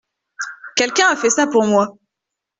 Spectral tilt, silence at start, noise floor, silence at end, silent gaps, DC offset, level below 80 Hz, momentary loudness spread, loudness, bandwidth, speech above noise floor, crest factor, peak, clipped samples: -2.5 dB/octave; 0.4 s; -82 dBFS; 0.7 s; none; under 0.1%; -62 dBFS; 15 LU; -16 LUFS; 8.2 kHz; 66 dB; 16 dB; -2 dBFS; under 0.1%